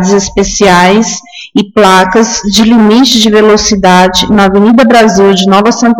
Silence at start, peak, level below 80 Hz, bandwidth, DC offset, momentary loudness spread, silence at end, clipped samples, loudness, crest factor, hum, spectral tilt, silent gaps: 0 s; 0 dBFS; -30 dBFS; 17 kHz; under 0.1%; 6 LU; 0 s; 1%; -5 LUFS; 6 dB; none; -4 dB/octave; none